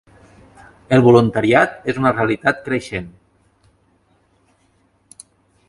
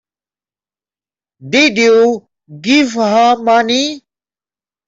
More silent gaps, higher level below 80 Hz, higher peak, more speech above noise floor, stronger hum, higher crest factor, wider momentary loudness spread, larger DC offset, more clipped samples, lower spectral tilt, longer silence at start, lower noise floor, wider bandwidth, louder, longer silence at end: neither; first, -50 dBFS vs -60 dBFS; about the same, 0 dBFS vs -2 dBFS; second, 44 dB vs over 79 dB; second, none vs 50 Hz at -50 dBFS; first, 20 dB vs 14 dB; first, 15 LU vs 12 LU; neither; neither; first, -7 dB/octave vs -3.5 dB/octave; second, 0.9 s vs 1.45 s; second, -60 dBFS vs under -90 dBFS; first, 11.5 kHz vs 7.8 kHz; second, -16 LUFS vs -11 LUFS; first, 2.6 s vs 0.9 s